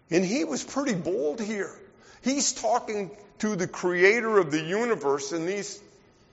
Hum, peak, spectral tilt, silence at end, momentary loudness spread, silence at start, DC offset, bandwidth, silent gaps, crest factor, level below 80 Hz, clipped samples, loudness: none; -6 dBFS; -3.5 dB/octave; 0.5 s; 12 LU; 0.1 s; under 0.1%; 8 kHz; none; 22 dB; -66 dBFS; under 0.1%; -26 LUFS